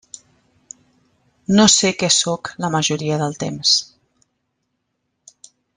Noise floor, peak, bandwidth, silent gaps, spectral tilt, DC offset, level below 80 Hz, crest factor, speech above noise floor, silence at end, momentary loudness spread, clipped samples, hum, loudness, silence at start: -73 dBFS; 0 dBFS; 10.5 kHz; none; -3 dB/octave; under 0.1%; -58 dBFS; 22 dB; 56 dB; 1.9 s; 11 LU; under 0.1%; none; -16 LUFS; 1.5 s